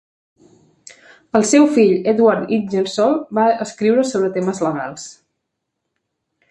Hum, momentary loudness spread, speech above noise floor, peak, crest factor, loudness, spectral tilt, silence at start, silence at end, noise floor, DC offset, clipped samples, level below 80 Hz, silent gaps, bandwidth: none; 9 LU; 61 dB; 0 dBFS; 18 dB; -16 LUFS; -5 dB/octave; 1.35 s; 1.4 s; -76 dBFS; under 0.1%; under 0.1%; -64 dBFS; none; 11.5 kHz